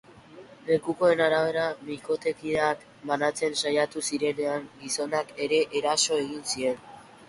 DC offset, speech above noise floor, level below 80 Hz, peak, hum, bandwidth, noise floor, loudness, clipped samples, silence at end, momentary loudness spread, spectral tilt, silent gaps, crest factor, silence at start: under 0.1%; 22 dB; -66 dBFS; -10 dBFS; none; 11.5 kHz; -49 dBFS; -27 LUFS; under 0.1%; 0.05 s; 8 LU; -3 dB/octave; none; 18 dB; 0.3 s